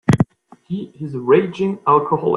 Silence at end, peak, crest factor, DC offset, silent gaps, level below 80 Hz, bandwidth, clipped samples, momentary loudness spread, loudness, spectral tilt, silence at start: 0 s; 0 dBFS; 18 dB; under 0.1%; none; -48 dBFS; 12 kHz; under 0.1%; 13 LU; -18 LUFS; -8 dB/octave; 0.1 s